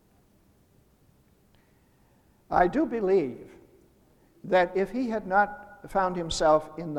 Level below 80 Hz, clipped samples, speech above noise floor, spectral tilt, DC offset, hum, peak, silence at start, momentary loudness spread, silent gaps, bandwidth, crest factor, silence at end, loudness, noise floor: -52 dBFS; under 0.1%; 37 dB; -5 dB/octave; under 0.1%; none; -8 dBFS; 2.5 s; 10 LU; none; 12.5 kHz; 22 dB; 0 s; -26 LUFS; -62 dBFS